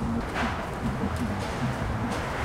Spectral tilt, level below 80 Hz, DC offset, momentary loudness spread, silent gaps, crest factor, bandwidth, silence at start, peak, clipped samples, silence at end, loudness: -6 dB/octave; -38 dBFS; under 0.1%; 1 LU; none; 12 dB; 16 kHz; 0 s; -16 dBFS; under 0.1%; 0 s; -30 LUFS